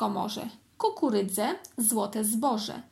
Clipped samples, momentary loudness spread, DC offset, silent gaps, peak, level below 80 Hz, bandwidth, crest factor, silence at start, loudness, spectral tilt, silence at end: under 0.1%; 7 LU; under 0.1%; none; -12 dBFS; -74 dBFS; 16.5 kHz; 16 dB; 0 s; -28 LUFS; -3.5 dB/octave; 0.1 s